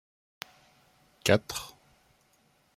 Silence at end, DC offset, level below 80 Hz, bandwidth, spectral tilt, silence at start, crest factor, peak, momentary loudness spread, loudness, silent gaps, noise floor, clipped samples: 1.05 s; under 0.1%; -64 dBFS; 16.5 kHz; -4 dB/octave; 1.25 s; 28 dB; -8 dBFS; 20 LU; -29 LUFS; none; -67 dBFS; under 0.1%